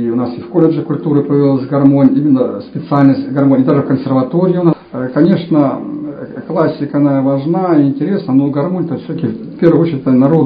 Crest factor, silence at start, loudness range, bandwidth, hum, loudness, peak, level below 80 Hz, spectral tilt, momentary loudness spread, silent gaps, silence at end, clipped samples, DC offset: 12 dB; 0 s; 3 LU; 5.2 kHz; none; -13 LUFS; 0 dBFS; -54 dBFS; -11.5 dB/octave; 9 LU; none; 0 s; 0.3%; under 0.1%